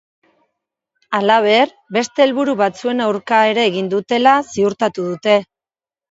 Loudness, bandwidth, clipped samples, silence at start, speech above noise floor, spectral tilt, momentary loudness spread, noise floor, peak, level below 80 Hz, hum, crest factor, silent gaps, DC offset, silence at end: -16 LUFS; 8 kHz; under 0.1%; 1.1 s; over 75 dB; -4.5 dB/octave; 7 LU; under -90 dBFS; 0 dBFS; -64 dBFS; none; 16 dB; none; under 0.1%; 0.7 s